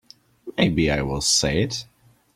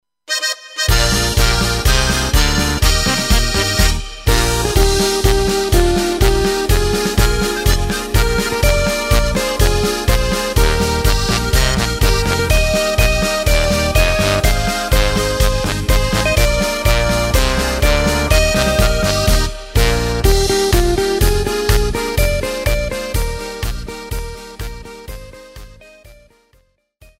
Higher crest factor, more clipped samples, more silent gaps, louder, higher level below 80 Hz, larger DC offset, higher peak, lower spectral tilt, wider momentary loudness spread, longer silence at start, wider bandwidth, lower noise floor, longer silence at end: first, 20 dB vs 14 dB; neither; neither; second, -21 LUFS vs -15 LUFS; second, -40 dBFS vs -18 dBFS; neither; second, -4 dBFS vs 0 dBFS; about the same, -3.5 dB/octave vs -4 dB/octave; first, 13 LU vs 6 LU; first, 0.45 s vs 0.3 s; about the same, 15.5 kHz vs 16.5 kHz; second, -42 dBFS vs -57 dBFS; second, 0.5 s vs 1.05 s